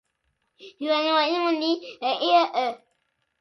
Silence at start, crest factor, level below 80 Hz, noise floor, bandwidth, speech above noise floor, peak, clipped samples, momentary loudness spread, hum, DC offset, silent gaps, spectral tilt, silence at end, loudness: 0.6 s; 18 dB; -80 dBFS; -74 dBFS; 11 kHz; 51 dB; -8 dBFS; under 0.1%; 10 LU; none; under 0.1%; none; -3 dB/octave; 0.65 s; -23 LUFS